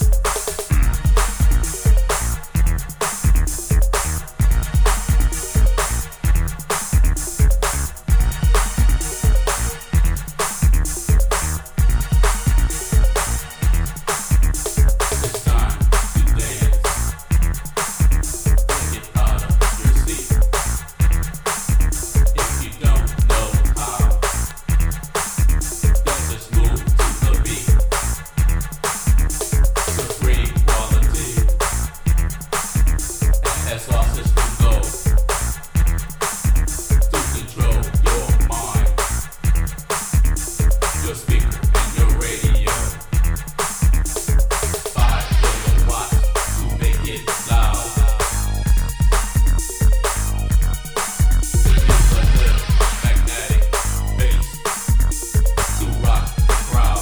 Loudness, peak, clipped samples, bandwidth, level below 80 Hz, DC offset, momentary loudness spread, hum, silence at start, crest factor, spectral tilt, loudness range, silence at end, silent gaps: -19 LUFS; 0 dBFS; under 0.1%; over 20 kHz; -18 dBFS; under 0.1%; 5 LU; none; 0 s; 16 dB; -4.5 dB/octave; 2 LU; 0 s; none